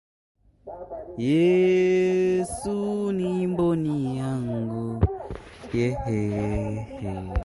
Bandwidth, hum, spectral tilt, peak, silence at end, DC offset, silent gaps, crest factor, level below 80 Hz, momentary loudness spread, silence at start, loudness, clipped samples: 11.5 kHz; none; -7.5 dB/octave; -8 dBFS; 0 s; under 0.1%; none; 18 dB; -40 dBFS; 16 LU; 0.65 s; -25 LUFS; under 0.1%